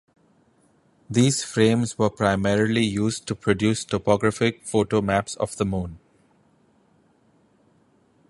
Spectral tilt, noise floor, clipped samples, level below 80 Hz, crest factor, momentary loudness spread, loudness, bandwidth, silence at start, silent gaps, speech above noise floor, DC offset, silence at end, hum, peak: -5.5 dB/octave; -61 dBFS; under 0.1%; -50 dBFS; 20 dB; 6 LU; -23 LUFS; 11.5 kHz; 1.1 s; none; 39 dB; under 0.1%; 2.35 s; none; -4 dBFS